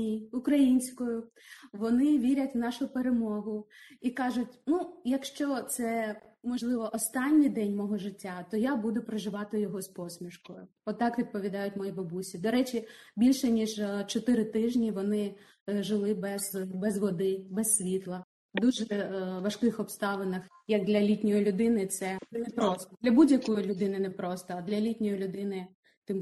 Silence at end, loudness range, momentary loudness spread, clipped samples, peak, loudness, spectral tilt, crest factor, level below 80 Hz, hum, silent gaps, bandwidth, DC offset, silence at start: 0 s; 5 LU; 12 LU; under 0.1%; -12 dBFS; -30 LUFS; -5 dB/octave; 18 dB; -68 dBFS; none; 15.61-15.66 s, 18.24-18.49 s, 25.75-25.83 s, 25.97-26.02 s; 12.5 kHz; under 0.1%; 0 s